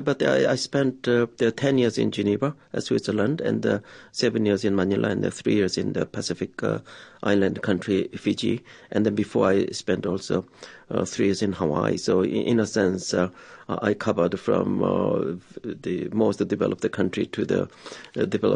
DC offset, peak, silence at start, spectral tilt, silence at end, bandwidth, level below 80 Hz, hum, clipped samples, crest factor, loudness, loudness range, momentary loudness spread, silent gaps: under 0.1%; -6 dBFS; 0 s; -6 dB/octave; 0 s; 10.5 kHz; -54 dBFS; none; under 0.1%; 18 dB; -24 LUFS; 2 LU; 8 LU; none